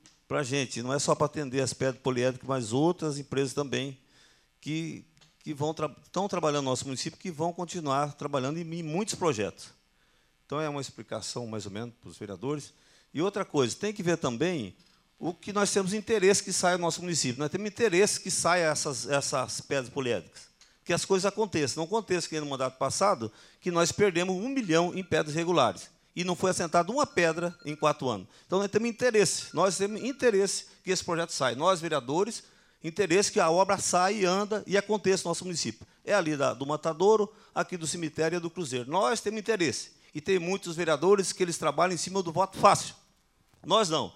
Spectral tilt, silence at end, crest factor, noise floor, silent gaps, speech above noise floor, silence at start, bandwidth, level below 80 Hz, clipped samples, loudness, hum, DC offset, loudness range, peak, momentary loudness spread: -4 dB/octave; 0.05 s; 24 dB; -67 dBFS; none; 38 dB; 0.3 s; 15.5 kHz; -68 dBFS; under 0.1%; -28 LUFS; none; under 0.1%; 7 LU; -6 dBFS; 12 LU